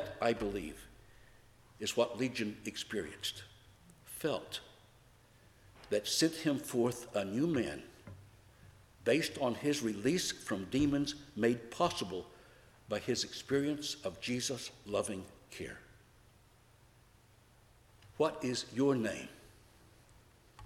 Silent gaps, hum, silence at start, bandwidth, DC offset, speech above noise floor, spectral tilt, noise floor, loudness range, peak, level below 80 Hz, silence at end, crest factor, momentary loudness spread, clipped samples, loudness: none; none; 0 s; 16.5 kHz; under 0.1%; 29 dB; -4 dB/octave; -64 dBFS; 8 LU; -16 dBFS; -64 dBFS; 0 s; 22 dB; 15 LU; under 0.1%; -36 LUFS